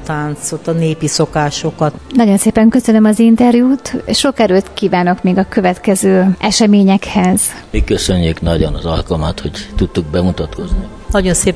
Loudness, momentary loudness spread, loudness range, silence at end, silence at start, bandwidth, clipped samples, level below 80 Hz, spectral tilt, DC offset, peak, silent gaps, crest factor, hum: -13 LUFS; 10 LU; 5 LU; 0 s; 0 s; 11 kHz; under 0.1%; -26 dBFS; -5 dB/octave; 0.5%; 0 dBFS; none; 12 dB; none